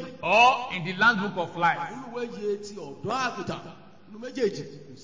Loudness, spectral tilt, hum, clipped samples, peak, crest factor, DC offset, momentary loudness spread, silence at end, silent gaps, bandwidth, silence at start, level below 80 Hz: -25 LUFS; -4.5 dB/octave; none; under 0.1%; -8 dBFS; 20 dB; 0.2%; 19 LU; 0 s; none; 7.6 kHz; 0 s; -64 dBFS